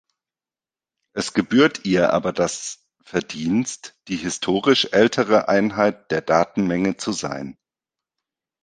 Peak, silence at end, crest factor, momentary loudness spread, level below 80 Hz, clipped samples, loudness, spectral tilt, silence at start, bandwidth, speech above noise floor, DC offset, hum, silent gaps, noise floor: 0 dBFS; 1.1 s; 22 dB; 13 LU; -56 dBFS; under 0.1%; -20 LUFS; -4.5 dB/octave; 1.15 s; 10 kHz; over 70 dB; under 0.1%; none; none; under -90 dBFS